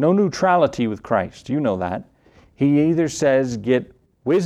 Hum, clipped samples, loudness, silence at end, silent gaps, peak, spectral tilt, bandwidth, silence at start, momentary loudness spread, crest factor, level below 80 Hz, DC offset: none; under 0.1%; -20 LUFS; 0 s; none; -4 dBFS; -6.5 dB/octave; 12 kHz; 0 s; 8 LU; 16 dB; -54 dBFS; under 0.1%